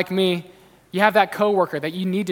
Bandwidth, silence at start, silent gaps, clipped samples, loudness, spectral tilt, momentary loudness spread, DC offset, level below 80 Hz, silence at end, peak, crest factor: 17.5 kHz; 0 s; none; under 0.1%; -21 LUFS; -6 dB/octave; 9 LU; under 0.1%; -66 dBFS; 0 s; 0 dBFS; 20 dB